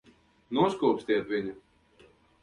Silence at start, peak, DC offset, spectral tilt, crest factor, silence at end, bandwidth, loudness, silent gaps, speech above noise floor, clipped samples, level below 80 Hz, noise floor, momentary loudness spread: 0.5 s; -12 dBFS; under 0.1%; -6.5 dB/octave; 20 dB; 0.85 s; 11 kHz; -29 LUFS; none; 33 dB; under 0.1%; -66 dBFS; -60 dBFS; 8 LU